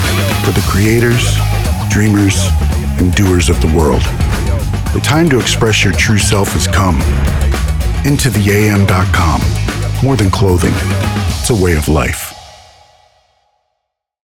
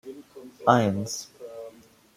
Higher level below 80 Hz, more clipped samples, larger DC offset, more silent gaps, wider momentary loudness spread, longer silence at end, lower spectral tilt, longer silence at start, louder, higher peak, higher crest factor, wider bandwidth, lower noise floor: first, -20 dBFS vs -68 dBFS; neither; neither; neither; second, 5 LU vs 23 LU; first, 1.75 s vs 0.45 s; about the same, -5 dB/octave vs -5.5 dB/octave; about the same, 0 s vs 0.05 s; first, -12 LUFS vs -25 LUFS; about the same, -2 dBFS vs -2 dBFS; second, 10 dB vs 26 dB; first, 18.5 kHz vs 16 kHz; first, -72 dBFS vs -50 dBFS